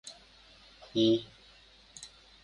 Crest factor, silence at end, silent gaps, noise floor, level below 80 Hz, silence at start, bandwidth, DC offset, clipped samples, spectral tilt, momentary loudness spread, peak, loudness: 20 dB; 0.4 s; none; -59 dBFS; -66 dBFS; 0.05 s; 11 kHz; under 0.1%; under 0.1%; -5.5 dB/octave; 26 LU; -16 dBFS; -29 LUFS